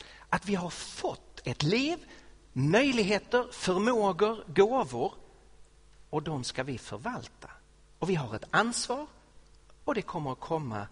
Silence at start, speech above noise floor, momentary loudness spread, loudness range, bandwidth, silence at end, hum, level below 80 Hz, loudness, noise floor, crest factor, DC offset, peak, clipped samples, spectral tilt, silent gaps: 0 s; 27 dB; 12 LU; 8 LU; 10.5 kHz; 0.05 s; none; -58 dBFS; -30 LUFS; -56 dBFS; 22 dB; under 0.1%; -8 dBFS; under 0.1%; -5 dB/octave; none